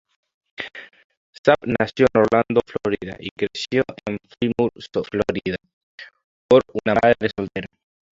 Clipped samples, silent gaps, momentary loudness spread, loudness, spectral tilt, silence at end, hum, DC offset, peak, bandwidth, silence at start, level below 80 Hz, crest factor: under 0.1%; 1.05-1.10 s, 1.17-1.33 s, 1.39-1.44 s, 3.31-3.36 s, 5.73-5.98 s, 6.24-6.49 s; 16 LU; -21 LUFS; -6.5 dB/octave; 0.5 s; none; under 0.1%; -2 dBFS; 7.6 kHz; 0.6 s; -52 dBFS; 20 dB